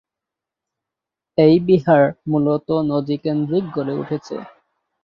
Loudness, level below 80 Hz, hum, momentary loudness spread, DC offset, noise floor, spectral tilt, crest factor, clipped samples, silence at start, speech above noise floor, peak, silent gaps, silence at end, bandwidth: -18 LUFS; -58 dBFS; none; 12 LU; under 0.1%; -86 dBFS; -9 dB/octave; 16 dB; under 0.1%; 1.4 s; 68 dB; -2 dBFS; none; 0.55 s; 7 kHz